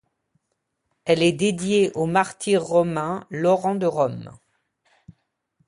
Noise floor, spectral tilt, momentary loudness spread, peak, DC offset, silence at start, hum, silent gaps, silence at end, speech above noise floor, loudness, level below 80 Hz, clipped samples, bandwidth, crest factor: -76 dBFS; -5.5 dB/octave; 7 LU; -4 dBFS; under 0.1%; 1.05 s; none; none; 1.35 s; 55 dB; -22 LUFS; -60 dBFS; under 0.1%; 11.5 kHz; 18 dB